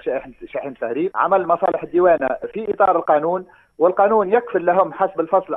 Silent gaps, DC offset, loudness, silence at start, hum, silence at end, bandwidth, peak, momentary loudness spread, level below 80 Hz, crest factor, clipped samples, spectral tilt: none; under 0.1%; -18 LUFS; 0.05 s; none; 0 s; 3.9 kHz; -2 dBFS; 11 LU; -58 dBFS; 16 dB; under 0.1%; -9.5 dB/octave